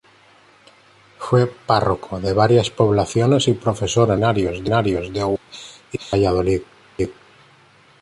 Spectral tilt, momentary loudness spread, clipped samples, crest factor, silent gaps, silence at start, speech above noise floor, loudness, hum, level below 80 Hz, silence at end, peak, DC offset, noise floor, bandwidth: -6 dB/octave; 11 LU; under 0.1%; 16 dB; none; 1.2 s; 34 dB; -19 LUFS; none; -42 dBFS; 0.9 s; -2 dBFS; under 0.1%; -52 dBFS; 11.5 kHz